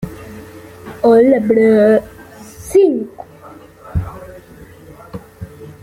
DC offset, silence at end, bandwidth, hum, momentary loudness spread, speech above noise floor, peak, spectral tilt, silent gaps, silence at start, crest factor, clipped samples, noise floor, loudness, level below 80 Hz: under 0.1%; 0.1 s; 16 kHz; none; 26 LU; 28 dB; -2 dBFS; -7.5 dB/octave; none; 0 s; 14 dB; under 0.1%; -39 dBFS; -13 LUFS; -38 dBFS